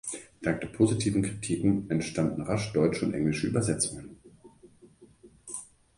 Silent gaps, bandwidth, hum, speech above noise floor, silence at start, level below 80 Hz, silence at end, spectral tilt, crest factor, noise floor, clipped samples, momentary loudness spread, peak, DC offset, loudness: none; 11.5 kHz; none; 29 dB; 0.05 s; -54 dBFS; 0.35 s; -5.5 dB/octave; 20 dB; -56 dBFS; under 0.1%; 14 LU; -10 dBFS; under 0.1%; -29 LUFS